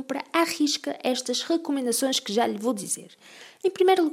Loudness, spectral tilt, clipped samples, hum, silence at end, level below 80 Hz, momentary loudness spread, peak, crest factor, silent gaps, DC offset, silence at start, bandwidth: -25 LUFS; -2.5 dB/octave; under 0.1%; none; 0 s; -86 dBFS; 7 LU; -8 dBFS; 18 dB; none; under 0.1%; 0 s; 16 kHz